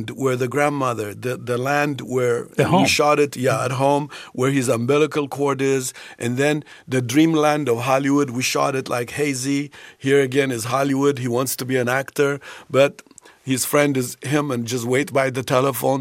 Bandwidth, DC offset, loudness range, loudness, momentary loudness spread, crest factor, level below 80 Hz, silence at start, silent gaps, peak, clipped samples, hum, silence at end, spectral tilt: 16 kHz; under 0.1%; 2 LU; -20 LUFS; 8 LU; 18 dB; -62 dBFS; 0 s; none; -2 dBFS; under 0.1%; none; 0 s; -5 dB/octave